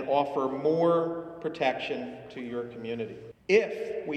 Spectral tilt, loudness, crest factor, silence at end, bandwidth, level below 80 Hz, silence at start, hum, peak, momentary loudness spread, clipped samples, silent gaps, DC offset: -6 dB/octave; -29 LUFS; 20 dB; 0 s; 9 kHz; -68 dBFS; 0 s; none; -10 dBFS; 13 LU; under 0.1%; none; under 0.1%